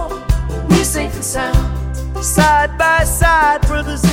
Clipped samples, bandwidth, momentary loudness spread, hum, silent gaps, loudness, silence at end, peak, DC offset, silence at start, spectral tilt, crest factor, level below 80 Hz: under 0.1%; 17 kHz; 8 LU; none; none; -15 LUFS; 0 s; 0 dBFS; under 0.1%; 0 s; -4.5 dB/octave; 14 dB; -20 dBFS